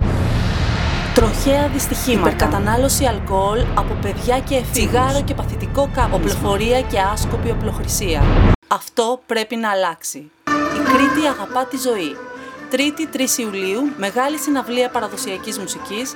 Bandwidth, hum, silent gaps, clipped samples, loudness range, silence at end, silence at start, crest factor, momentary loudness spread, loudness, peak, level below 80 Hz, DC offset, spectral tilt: 18 kHz; none; 8.55-8.62 s; under 0.1%; 3 LU; 0 s; 0 s; 18 dB; 8 LU; -18 LUFS; 0 dBFS; -26 dBFS; under 0.1%; -4.5 dB/octave